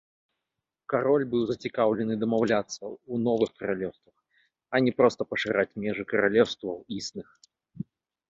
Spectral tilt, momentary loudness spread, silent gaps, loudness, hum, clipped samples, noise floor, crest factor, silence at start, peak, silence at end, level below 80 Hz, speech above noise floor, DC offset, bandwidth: -5.5 dB/octave; 14 LU; none; -27 LUFS; none; under 0.1%; -86 dBFS; 22 dB; 0.9 s; -6 dBFS; 0.5 s; -64 dBFS; 60 dB; under 0.1%; 7.8 kHz